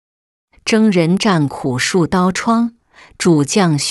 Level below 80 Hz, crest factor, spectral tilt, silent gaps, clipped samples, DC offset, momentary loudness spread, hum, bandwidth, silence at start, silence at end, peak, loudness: -48 dBFS; 14 dB; -5 dB/octave; none; under 0.1%; under 0.1%; 6 LU; none; 12 kHz; 0.65 s; 0 s; -2 dBFS; -15 LUFS